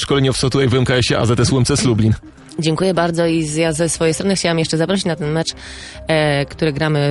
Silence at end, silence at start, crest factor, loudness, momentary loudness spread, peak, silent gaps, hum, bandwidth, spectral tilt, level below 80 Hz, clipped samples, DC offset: 0 s; 0 s; 14 dB; -16 LUFS; 6 LU; -2 dBFS; none; none; 11.5 kHz; -5 dB/octave; -38 dBFS; under 0.1%; under 0.1%